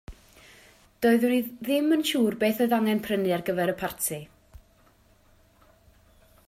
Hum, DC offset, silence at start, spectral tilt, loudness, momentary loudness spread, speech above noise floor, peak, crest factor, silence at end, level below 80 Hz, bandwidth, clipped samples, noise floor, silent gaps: none; under 0.1%; 0.1 s; -4.5 dB/octave; -25 LUFS; 6 LU; 35 dB; -10 dBFS; 18 dB; 1.9 s; -58 dBFS; 16 kHz; under 0.1%; -60 dBFS; none